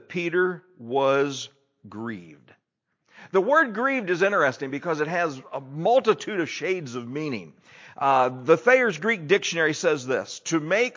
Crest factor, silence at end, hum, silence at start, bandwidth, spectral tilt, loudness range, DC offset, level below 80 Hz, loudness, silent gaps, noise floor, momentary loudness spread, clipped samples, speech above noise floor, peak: 18 dB; 0.05 s; none; 0.1 s; 7.6 kHz; -4.5 dB/octave; 4 LU; under 0.1%; -76 dBFS; -23 LUFS; none; -74 dBFS; 15 LU; under 0.1%; 50 dB; -6 dBFS